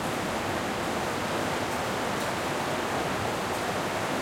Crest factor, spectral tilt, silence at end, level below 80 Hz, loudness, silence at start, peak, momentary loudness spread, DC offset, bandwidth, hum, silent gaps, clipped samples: 12 dB; -4 dB/octave; 0 s; -54 dBFS; -29 LUFS; 0 s; -16 dBFS; 1 LU; under 0.1%; 16.5 kHz; none; none; under 0.1%